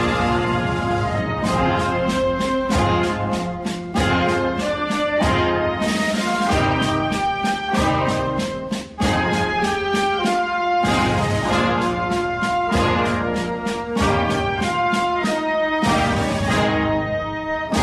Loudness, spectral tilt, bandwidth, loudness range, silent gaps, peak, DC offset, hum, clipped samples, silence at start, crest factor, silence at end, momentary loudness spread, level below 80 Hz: -20 LUFS; -5.5 dB/octave; 14 kHz; 1 LU; none; -6 dBFS; under 0.1%; none; under 0.1%; 0 s; 14 dB; 0 s; 5 LU; -36 dBFS